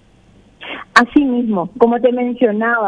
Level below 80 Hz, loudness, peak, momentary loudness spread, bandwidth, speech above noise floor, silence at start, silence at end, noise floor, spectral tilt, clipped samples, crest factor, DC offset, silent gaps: -50 dBFS; -14 LUFS; 0 dBFS; 17 LU; 11 kHz; 34 dB; 0.6 s; 0 s; -48 dBFS; -5.5 dB/octave; 0.3%; 16 dB; under 0.1%; none